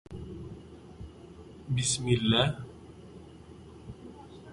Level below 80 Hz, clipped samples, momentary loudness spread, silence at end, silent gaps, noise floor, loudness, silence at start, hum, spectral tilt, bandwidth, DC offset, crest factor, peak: -52 dBFS; under 0.1%; 24 LU; 0 s; none; -49 dBFS; -28 LUFS; 0.1 s; none; -4 dB/octave; 11.5 kHz; under 0.1%; 22 dB; -12 dBFS